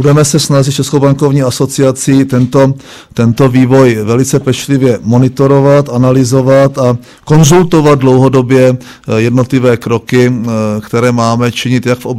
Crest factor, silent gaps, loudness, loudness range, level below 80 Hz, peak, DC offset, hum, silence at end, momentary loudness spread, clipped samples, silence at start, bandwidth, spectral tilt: 8 dB; none; -9 LUFS; 2 LU; -40 dBFS; 0 dBFS; under 0.1%; none; 0 s; 6 LU; 2%; 0 s; 15 kHz; -6 dB/octave